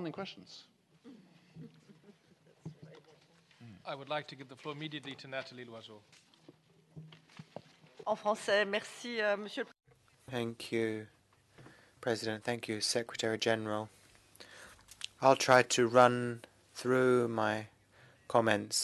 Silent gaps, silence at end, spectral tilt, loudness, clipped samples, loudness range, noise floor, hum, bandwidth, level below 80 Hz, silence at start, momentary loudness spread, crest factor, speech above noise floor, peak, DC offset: none; 0 s; -4 dB/octave; -33 LUFS; under 0.1%; 17 LU; -66 dBFS; none; 12 kHz; -76 dBFS; 0 s; 26 LU; 26 dB; 33 dB; -8 dBFS; under 0.1%